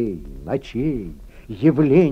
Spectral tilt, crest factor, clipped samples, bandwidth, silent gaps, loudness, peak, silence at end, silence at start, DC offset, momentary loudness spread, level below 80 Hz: -9.5 dB/octave; 16 dB; under 0.1%; 6.6 kHz; none; -20 LUFS; -4 dBFS; 0 s; 0 s; under 0.1%; 19 LU; -40 dBFS